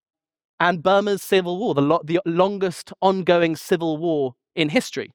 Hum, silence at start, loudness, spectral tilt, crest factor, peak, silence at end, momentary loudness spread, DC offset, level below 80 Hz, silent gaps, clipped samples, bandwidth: none; 0.6 s; -21 LUFS; -5.5 dB/octave; 18 dB; -4 dBFS; 0.1 s; 6 LU; under 0.1%; -62 dBFS; none; under 0.1%; 19.5 kHz